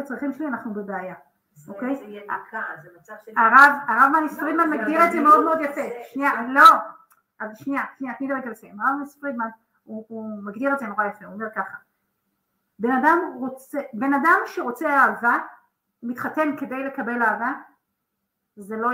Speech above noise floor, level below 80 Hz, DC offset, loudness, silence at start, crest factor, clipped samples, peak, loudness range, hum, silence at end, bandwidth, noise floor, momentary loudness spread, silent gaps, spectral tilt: 57 dB; -76 dBFS; under 0.1%; -20 LUFS; 0 s; 22 dB; under 0.1%; -2 dBFS; 12 LU; none; 0 s; 16 kHz; -78 dBFS; 19 LU; none; -4.5 dB/octave